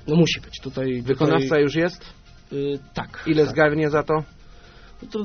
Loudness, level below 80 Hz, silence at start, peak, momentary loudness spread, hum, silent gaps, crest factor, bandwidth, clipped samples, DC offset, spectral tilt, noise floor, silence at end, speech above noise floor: -22 LUFS; -46 dBFS; 0.05 s; -4 dBFS; 14 LU; none; none; 18 dB; 6.6 kHz; under 0.1%; under 0.1%; -5 dB/octave; -45 dBFS; 0 s; 24 dB